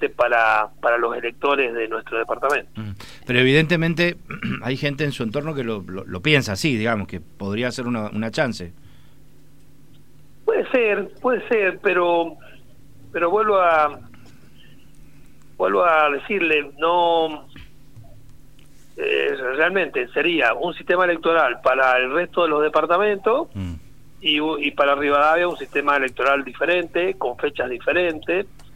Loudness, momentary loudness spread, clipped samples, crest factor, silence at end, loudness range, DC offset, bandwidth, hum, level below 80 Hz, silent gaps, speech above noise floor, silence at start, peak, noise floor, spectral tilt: -20 LUFS; 10 LU; under 0.1%; 20 dB; 0.1 s; 5 LU; 0.8%; 16 kHz; none; -52 dBFS; none; 31 dB; 0 s; -2 dBFS; -52 dBFS; -5.5 dB/octave